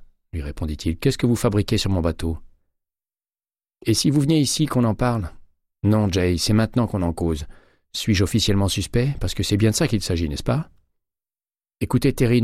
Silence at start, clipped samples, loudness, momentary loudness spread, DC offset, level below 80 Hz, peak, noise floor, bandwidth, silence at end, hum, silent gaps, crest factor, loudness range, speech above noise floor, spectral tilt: 0 s; under 0.1%; -21 LUFS; 11 LU; under 0.1%; -36 dBFS; -6 dBFS; under -90 dBFS; 15.5 kHz; 0 s; none; none; 16 dB; 3 LU; over 70 dB; -5.5 dB/octave